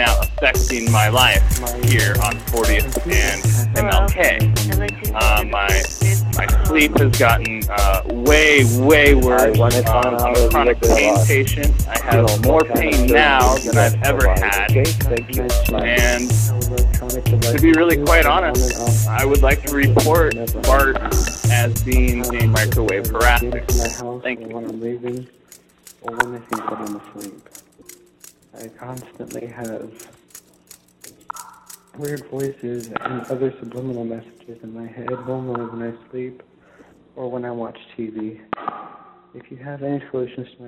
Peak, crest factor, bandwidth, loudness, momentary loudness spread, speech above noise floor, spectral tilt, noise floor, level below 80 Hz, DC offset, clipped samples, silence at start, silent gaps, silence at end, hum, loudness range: 0 dBFS; 16 dB; 16 kHz; -16 LUFS; 18 LU; 33 dB; -4.5 dB/octave; -49 dBFS; -24 dBFS; under 0.1%; under 0.1%; 0 s; none; 0 s; none; 17 LU